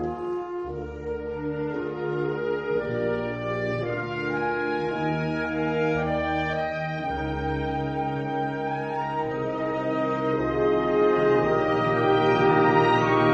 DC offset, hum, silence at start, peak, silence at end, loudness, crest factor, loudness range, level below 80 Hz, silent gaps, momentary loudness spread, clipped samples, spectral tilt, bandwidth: under 0.1%; none; 0 s; -8 dBFS; 0 s; -25 LUFS; 18 dB; 6 LU; -46 dBFS; none; 10 LU; under 0.1%; -7.5 dB/octave; 8 kHz